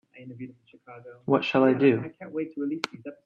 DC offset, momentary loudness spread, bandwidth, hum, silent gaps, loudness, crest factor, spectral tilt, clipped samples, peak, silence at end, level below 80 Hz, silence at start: under 0.1%; 24 LU; 7.6 kHz; none; none; -25 LUFS; 20 dB; -7 dB/octave; under 0.1%; -8 dBFS; 0.1 s; -72 dBFS; 0.15 s